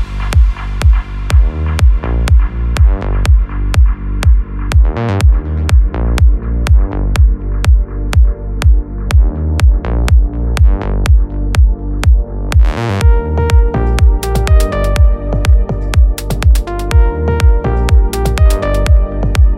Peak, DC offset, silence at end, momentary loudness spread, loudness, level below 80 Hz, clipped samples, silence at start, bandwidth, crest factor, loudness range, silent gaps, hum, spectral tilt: 0 dBFS; under 0.1%; 0 s; 3 LU; -13 LUFS; -10 dBFS; under 0.1%; 0 s; 12.5 kHz; 10 dB; 1 LU; none; none; -6.5 dB/octave